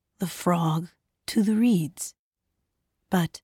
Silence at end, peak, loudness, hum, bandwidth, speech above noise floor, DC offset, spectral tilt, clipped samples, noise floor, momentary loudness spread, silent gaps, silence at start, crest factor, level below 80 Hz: 0.05 s; -12 dBFS; -26 LUFS; none; 17 kHz; 56 dB; under 0.1%; -6 dB/octave; under 0.1%; -81 dBFS; 14 LU; 2.19-2.31 s; 0.2 s; 16 dB; -64 dBFS